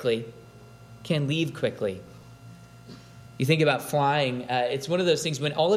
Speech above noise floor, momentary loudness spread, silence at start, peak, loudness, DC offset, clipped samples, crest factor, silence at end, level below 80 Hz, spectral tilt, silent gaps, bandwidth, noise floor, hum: 23 dB; 22 LU; 0 s; -8 dBFS; -26 LUFS; under 0.1%; under 0.1%; 20 dB; 0 s; -62 dBFS; -5.5 dB/octave; none; 16 kHz; -48 dBFS; 60 Hz at -55 dBFS